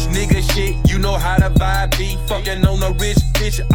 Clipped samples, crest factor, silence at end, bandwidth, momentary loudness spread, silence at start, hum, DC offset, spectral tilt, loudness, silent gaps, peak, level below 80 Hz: under 0.1%; 14 dB; 0 s; 18 kHz; 5 LU; 0 s; none; 1%; -5 dB/octave; -17 LUFS; none; -2 dBFS; -18 dBFS